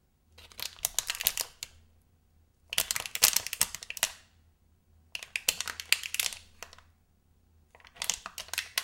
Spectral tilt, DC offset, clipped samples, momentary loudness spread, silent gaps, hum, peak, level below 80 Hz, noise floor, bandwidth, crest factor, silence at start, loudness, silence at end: 2 dB/octave; under 0.1%; under 0.1%; 20 LU; none; none; -2 dBFS; -62 dBFS; -66 dBFS; 17 kHz; 34 dB; 0.4 s; -30 LUFS; 0 s